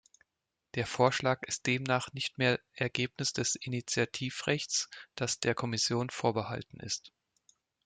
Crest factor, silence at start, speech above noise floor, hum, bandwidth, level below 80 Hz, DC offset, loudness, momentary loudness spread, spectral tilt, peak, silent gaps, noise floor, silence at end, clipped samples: 24 dB; 0.75 s; 54 dB; none; 9.6 kHz; -68 dBFS; under 0.1%; -32 LUFS; 8 LU; -3.5 dB/octave; -10 dBFS; none; -87 dBFS; 0.75 s; under 0.1%